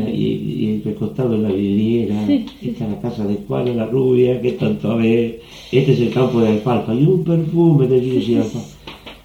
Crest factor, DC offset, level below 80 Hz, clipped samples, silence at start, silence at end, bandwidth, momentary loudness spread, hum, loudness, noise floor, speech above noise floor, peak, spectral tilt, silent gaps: 16 dB; under 0.1%; -48 dBFS; under 0.1%; 0 s; 0.1 s; 15.5 kHz; 9 LU; none; -17 LUFS; -37 dBFS; 20 dB; -2 dBFS; -8.5 dB/octave; none